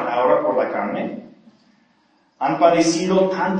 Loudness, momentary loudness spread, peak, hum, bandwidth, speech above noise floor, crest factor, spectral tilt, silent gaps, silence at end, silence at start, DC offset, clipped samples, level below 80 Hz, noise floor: -19 LUFS; 12 LU; 0 dBFS; none; 9.8 kHz; 42 dB; 20 dB; -5 dB/octave; none; 0 s; 0 s; under 0.1%; under 0.1%; -64 dBFS; -60 dBFS